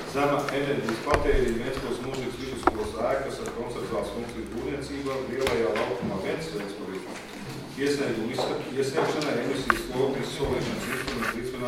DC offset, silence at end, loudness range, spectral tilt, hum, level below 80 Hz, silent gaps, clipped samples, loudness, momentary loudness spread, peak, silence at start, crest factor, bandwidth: under 0.1%; 0 s; 3 LU; -5 dB/octave; none; -42 dBFS; none; under 0.1%; -29 LUFS; 9 LU; -2 dBFS; 0 s; 26 dB; 16.5 kHz